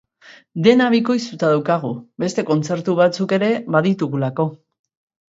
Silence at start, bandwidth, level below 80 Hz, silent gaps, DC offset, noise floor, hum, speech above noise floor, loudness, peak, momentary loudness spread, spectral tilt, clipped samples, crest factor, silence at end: 0.3 s; 7.8 kHz; -64 dBFS; none; under 0.1%; -47 dBFS; none; 30 dB; -18 LUFS; 0 dBFS; 9 LU; -6.5 dB/octave; under 0.1%; 18 dB; 0.75 s